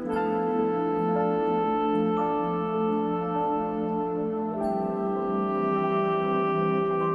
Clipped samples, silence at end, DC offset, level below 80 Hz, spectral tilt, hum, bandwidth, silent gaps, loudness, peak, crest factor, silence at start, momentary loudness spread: under 0.1%; 0 s; under 0.1%; -58 dBFS; -9.5 dB/octave; none; 5.2 kHz; none; -26 LUFS; -14 dBFS; 12 dB; 0 s; 3 LU